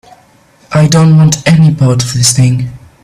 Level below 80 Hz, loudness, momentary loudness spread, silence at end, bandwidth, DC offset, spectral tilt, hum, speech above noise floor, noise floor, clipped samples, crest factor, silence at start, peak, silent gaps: -38 dBFS; -8 LUFS; 8 LU; 0.25 s; 14 kHz; under 0.1%; -5 dB/octave; none; 38 dB; -45 dBFS; under 0.1%; 8 dB; 0.7 s; 0 dBFS; none